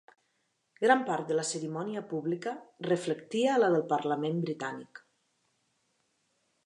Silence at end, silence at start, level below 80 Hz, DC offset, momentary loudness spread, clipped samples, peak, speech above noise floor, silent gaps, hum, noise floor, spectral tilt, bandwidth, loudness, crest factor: 1.7 s; 0.8 s; -86 dBFS; under 0.1%; 11 LU; under 0.1%; -10 dBFS; 47 dB; none; none; -77 dBFS; -5 dB/octave; 11 kHz; -31 LUFS; 22 dB